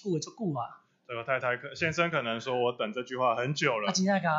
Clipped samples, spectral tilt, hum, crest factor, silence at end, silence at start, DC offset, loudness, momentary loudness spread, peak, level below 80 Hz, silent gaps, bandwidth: under 0.1%; -4.5 dB/octave; none; 20 dB; 0 s; 0.05 s; under 0.1%; -30 LUFS; 8 LU; -10 dBFS; -70 dBFS; none; 8 kHz